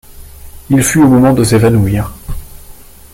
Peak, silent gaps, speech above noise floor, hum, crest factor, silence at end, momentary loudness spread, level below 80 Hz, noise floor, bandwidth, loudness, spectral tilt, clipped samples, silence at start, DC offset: 0 dBFS; none; 26 dB; none; 12 dB; 0.4 s; 21 LU; -30 dBFS; -34 dBFS; 17 kHz; -10 LUFS; -6 dB/octave; under 0.1%; 0.15 s; under 0.1%